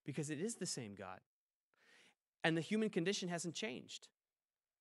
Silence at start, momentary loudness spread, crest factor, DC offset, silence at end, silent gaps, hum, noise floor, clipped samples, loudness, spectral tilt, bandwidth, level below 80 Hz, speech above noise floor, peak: 0.05 s; 15 LU; 26 dB; under 0.1%; 0.75 s; 1.26-1.71 s, 2.28-2.32 s; none; under -90 dBFS; under 0.1%; -41 LUFS; -4 dB/octave; 13 kHz; under -90 dBFS; over 48 dB; -18 dBFS